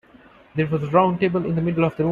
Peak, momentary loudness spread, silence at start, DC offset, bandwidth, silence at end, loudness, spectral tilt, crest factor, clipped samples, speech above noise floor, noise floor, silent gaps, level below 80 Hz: -4 dBFS; 7 LU; 0.55 s; under 0.1%; 4.6 kHz; 0 s; -21 LUFS; -9.5 dB/octave; 18 dB; under 0.1%; 30 dB; -50 dBFS; none; -52 dBFS